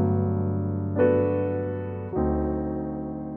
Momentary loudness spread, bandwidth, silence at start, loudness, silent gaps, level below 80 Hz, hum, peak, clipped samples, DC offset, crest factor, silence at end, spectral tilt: 9 LU; 3.3 kHz; 0 s; -26 LUFS; none; -40 dBFS; none; -10 dBFS; under 0.1%; under 0.1%; 16 dB; 0 s; -13 dB/octave